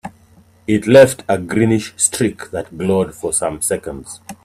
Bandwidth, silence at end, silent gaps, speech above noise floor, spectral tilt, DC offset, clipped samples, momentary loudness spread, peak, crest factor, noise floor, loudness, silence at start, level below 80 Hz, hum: 14.5 kHz; 0.1 s; none; 33 dB; -4.5 dB/octave; under 0.1%; under 0.1%; 20 LU; 0 dBFS; 16 dB; -49 dBFS; -15 LUFS; 0.05 s; -48 dBFS; none